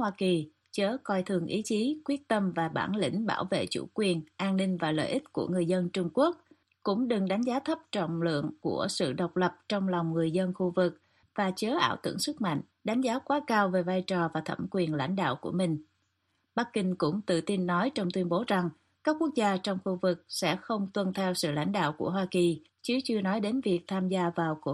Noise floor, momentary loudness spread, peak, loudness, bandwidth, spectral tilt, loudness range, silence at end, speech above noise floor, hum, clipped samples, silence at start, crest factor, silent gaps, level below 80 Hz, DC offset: -76 dBFS; 4 LU; -12 dBFS; -30 LUFS; 12 kHz; -5.5 dB/octave; 1 LU; 0 s; 47 dB; none; under 0.1%; 0 s; 18 dB; none; -70 dBFS; under 0.1%